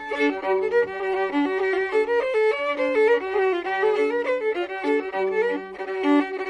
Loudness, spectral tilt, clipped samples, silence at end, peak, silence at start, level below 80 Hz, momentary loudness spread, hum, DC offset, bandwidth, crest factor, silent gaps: -23 LUFS; -4.5 dB/octave; under 0.1%; 0 s; -10 dBFS; 0 s; -62 dBFS; 5 LU; none; under 0.1%; 10 kHz; 14 dB; none